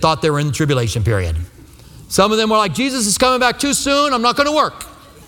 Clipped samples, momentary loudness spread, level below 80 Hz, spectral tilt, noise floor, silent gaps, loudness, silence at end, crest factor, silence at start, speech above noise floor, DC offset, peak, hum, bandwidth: under 0.1%; 8 LU; -36 dBFS; -4 dB/octave; -40 dBFS; none; -15 LUFS; 0.05 s; 16 dB; 0 s; 24 dB; under 0.1%; 0 dBFS; none; 19 kHz